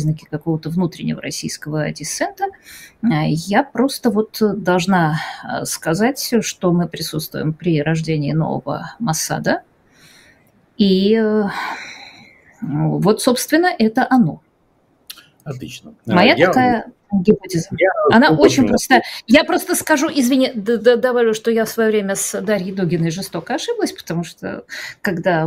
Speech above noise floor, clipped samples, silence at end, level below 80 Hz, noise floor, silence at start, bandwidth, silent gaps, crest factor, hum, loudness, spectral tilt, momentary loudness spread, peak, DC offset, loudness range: 42 dB; under 0.1%; 0 s; -52 dBFS; -59 dBFS; 0 s; 16 kHz; none; 18 dB; none; -17 LUFS; -5 dB/octave; 13 LU; 0 dBFS; under 0.1%; 7 LU